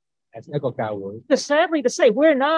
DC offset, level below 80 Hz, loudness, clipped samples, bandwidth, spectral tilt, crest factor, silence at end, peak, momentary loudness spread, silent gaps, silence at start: under 0.1%; -72 dBFS; -20 LUFS; under 0.1%; 11 kHz; -4.5 dB/octave; 16 dB; 0 s; -4 dBFS; 12 LU; none; 0.35 s